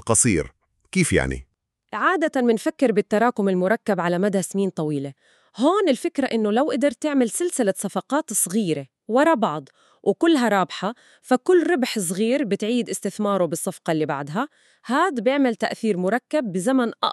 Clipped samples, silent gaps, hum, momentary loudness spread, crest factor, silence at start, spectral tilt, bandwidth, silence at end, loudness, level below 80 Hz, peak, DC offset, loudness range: under 0.1%; none; none; 9 LU; 18 dB; 0.05 s; -4.5 dB/octave; 13.5 kHz; 0 s; -22 LUFS; -48 dBFS; -4 dBFS; under 0.1%; 2 LU